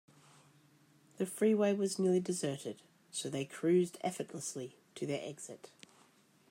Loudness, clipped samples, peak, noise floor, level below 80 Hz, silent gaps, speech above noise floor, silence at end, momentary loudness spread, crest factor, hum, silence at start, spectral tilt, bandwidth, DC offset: -35 LUFS; under 0.1%; -20 dBFS; -67 dBFS; -84 dBFS; none; 32 dB; 0.85 s; 17 LU; 16 dB; none; 1.2 s; -5 dB/octave; 16 kHz; under 0.1%